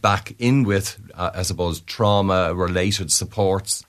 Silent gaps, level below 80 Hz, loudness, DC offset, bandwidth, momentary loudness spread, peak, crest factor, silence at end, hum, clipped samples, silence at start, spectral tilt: none; -44 dBFS; -21 LUFS; under 0.1%; 14 kHz; 7 LU; -4 dBFS; 18 dB; 0.05 s; none; under 0.1%; 0.05 s; -4.5 dB/octave